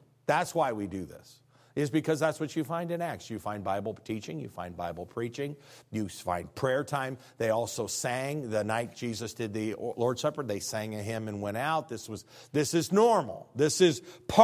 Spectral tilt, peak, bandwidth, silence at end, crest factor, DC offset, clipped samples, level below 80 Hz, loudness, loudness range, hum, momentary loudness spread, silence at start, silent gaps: -5 dB/octave; -6 dBFS; 16 kHz; 0 s; 26 dB; under 0.1%; under 0.1%; -60 dBFS; -31 LUFS; 6 LU; none; 12 LU; 0.3 s; none